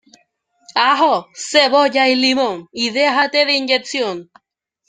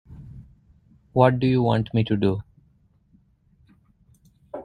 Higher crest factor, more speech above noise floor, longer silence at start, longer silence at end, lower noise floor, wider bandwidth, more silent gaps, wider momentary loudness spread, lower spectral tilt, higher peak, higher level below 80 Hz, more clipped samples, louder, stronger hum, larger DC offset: second, 16 dB vs 24 dB; first, 45 dB vs 41 dB; first, 0.7 s vs 0.1 s; first, 0.65 s vs 0 s; about the same, -60 dBFS vs -61 dBFS; about the same, 9.6 kHz vs 9.6 kHz; neither; second, 8 LU vs 25 LU; second, -2 dB/octave vs -9.5 dB/octave; about the same, 0 dBFS vs -2 dBFS; second, -68 dBFS vs -52 dBFS; neither; first, -15 LUFS vs -22 LUFS; neither; neither